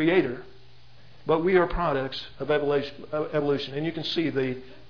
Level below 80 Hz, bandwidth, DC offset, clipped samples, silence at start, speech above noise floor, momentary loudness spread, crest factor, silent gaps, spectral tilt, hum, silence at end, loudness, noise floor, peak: -46 dBFS; 5.4 kHz; 0.6%; under 0.1%; 0 s; 28 dB; 10 LU; 18 dB; none; -7.5 dB/octave; none; 0.15 s; -26 LUFS; -54 dBFS; -8 dBFS